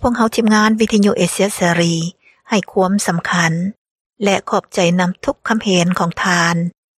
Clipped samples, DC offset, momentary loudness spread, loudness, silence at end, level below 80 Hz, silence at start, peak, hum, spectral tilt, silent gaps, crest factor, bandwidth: under 0.1%; under 0.1%; 7 LU; -16 LUFS; 0.3 s; -44 dBFS; 0 s; 0 dBFS; none; -4.5 dB/octave; 3.78-3.85 s, 3.91-4.10 s; 16 dB; 15 kHz